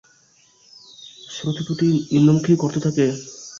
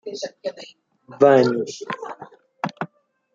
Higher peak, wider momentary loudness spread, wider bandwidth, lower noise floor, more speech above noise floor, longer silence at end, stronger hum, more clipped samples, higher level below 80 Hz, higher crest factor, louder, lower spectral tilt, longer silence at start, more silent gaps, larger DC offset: about the same, -4 dBFS vs -2 dBFS; about the same, 22 LU vs 21 LU; about the same, 7.6 kHz vs 7.6 kHz; first, -56 dBFS vs -47 dBFS; first, 38 dB vs 28 dB; second, 0 s vs 0.5 s; neither; neither; first, -58 dBFS vs -70 dBFS; about the same, 16 dB vs 20 dB; about the same, -19 LUFS vs -21 LUFS; about the same, -6.5 dB/octave vs -5.5 dB/octave; first, 1.05 s vs 0.05 s; neither; neither